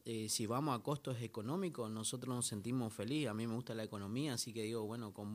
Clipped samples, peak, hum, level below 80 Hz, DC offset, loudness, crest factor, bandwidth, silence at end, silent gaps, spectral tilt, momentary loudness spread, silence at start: under 0.1%; -24 dBFS; none; -82 dBFS; under 0.1%; -41 LUFS; 18 dB; 15.5 kHz; 0 s; none; -4.5 dB/octave; 6 LU; 0.05 s